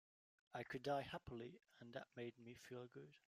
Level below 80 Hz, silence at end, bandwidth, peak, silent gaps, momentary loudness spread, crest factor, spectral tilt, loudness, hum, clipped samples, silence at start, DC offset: -78 dBFS; 0.15 s; 15.5 kHz; -32 dBFS; none; 14 LU; 20 dB; -5.5 dB/octave; -52 LUFS; none; under 0.1%; 0.5 s; under 0.1%